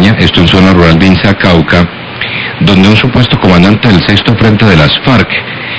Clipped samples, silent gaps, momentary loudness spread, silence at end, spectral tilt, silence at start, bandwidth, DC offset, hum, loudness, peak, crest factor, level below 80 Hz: 9%; none; 8 LU; 0 s; -6.5 dB/octave; 0 s; 8 kHz; 2%; none; -6 LUFS; 0 dBFS; 6 dB; -22 dBFS